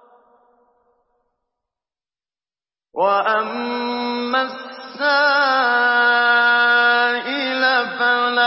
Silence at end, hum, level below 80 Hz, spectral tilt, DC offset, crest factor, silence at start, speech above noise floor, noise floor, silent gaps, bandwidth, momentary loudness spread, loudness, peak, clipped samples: 0 s; none; -76 dBFS; -6 dB/octave; under 0.1%; 14 dB; 2.95 s; over 72 dB; under -90 dBFS; none; 5.8 kHz; 10 LU; -17 LUFS; -4 dBFS; under 0.1%